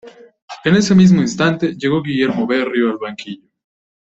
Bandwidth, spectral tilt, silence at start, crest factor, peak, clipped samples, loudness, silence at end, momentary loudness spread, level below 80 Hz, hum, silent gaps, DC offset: 8 kHz; -6 dB/octave; 0.05 s; 14 dB; -2 dBFS; under 0.1%; -15 LUFS; 0.75 s; 19 LU; -52 dBFS; none; 0.42-0.48 s; under 0.1%